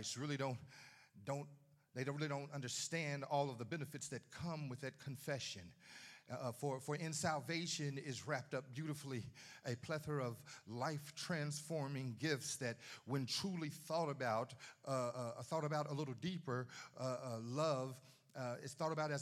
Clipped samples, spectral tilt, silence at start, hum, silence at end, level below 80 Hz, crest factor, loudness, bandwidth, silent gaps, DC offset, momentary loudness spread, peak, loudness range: under 0.1%; -4.5 dB/octave; 0 s; none; 0 s; -82 dBFS; 20 dB; -44 LUFS; 15 kHz; none; under 0.1%; 11 LU; -24 dBFS; 3 LU